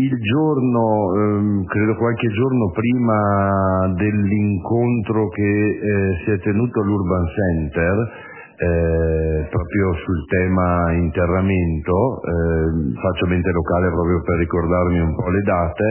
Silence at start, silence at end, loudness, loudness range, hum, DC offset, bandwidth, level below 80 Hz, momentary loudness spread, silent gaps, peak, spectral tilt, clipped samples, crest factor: 0 s; 0 s; -19 LUFS; 2 LU; none; under 0.1%; 3.2 kHz; -30 dBFS; 3 LU; none; -6 dBFS; -12 dB/octave; under 0.1%; 12 dB